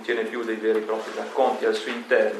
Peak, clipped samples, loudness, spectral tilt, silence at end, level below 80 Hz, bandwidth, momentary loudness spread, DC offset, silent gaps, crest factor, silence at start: -8 dBFS; under 0.1%; -25 LUFS; -3.5 dB/octave; 0 s; -84 dBFS; 13 kHz; 7 LU; under 0.1%; none; 16 dB; 0 s